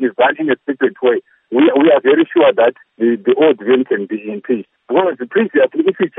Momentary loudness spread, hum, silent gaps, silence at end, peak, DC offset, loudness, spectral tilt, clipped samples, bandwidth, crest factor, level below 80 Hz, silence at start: 9 LU; none; none; 0.1 s; 0 dBFS; under 0.1%; -14 LUFS; -9 dB/octave; under 0.1%; 3.9 kHz; 12 dB; -74 dBFS; 0 s